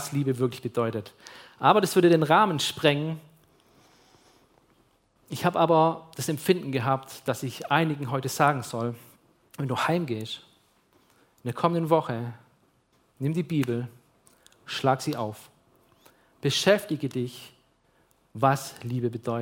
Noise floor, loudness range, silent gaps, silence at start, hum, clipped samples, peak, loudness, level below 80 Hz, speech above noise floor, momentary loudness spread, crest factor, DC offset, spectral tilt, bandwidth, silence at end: -66 dBFS; 7 LU; none; 0 s; none; under 0.1%; -4 dBFS; -26 LUFS; -68 dBFS; 41 dB; 16 LU; 22 dB; under 0.1%; -5.5 dB/octave; 17 kHz; 0 s